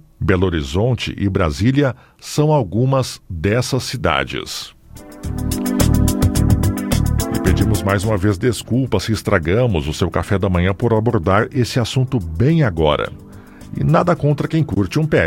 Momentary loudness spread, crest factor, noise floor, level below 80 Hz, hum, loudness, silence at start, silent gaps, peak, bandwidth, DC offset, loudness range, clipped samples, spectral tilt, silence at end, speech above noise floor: 7 LU; 16 dB; -38 dBFS; -28 dBFS; none; -18 LUFS; 0.2 s; none; 0 dBFS; 16.5 kHz; under 0.1%; 2 LU; under 0.1%; -6 dB/octave; 0 s; 21 dB